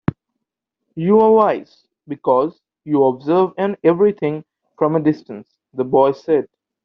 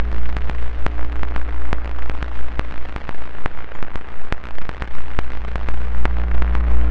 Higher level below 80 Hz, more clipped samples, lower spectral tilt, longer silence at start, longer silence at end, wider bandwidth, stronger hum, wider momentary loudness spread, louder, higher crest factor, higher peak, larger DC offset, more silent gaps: second, -56 dBFS vs -24 dBFS; neither; about the same, -7.5 dB/octave vs -7.5 dB/octave; first, 0.95 s vs 0 s; first, 0.4 s vs 0 s; first, 6 kHz vs 5.4 kHz; neither; first, 18 LU vs 11 LU; first, -17 LUFS vs -27 LUFS; first, 16 dB vs 10 dB; about the same, -2 dBFS vs -2 dBFS; neither; neither